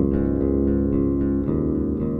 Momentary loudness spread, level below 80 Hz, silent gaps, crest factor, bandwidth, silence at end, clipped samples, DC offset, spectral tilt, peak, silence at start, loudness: 2 LU; -30 dBFS; none; 12 dB; 2.8 kHz; 0 s; under 0.1%; under 0.1%; -13 dB/octave; -8 dBFS; 0 s; -22 LUFS